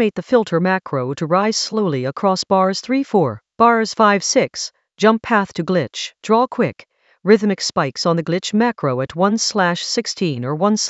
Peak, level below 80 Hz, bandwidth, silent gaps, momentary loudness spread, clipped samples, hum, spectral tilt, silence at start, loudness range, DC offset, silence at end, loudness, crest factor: 0 dBFS; -60 dBFS; 8.2 kHz; none; 7 LU; under 0.1%; none; -4.5 dB/octave; 0 s; 2 LU; under 0.1%; 0 s; -18 LUFS; 18 dB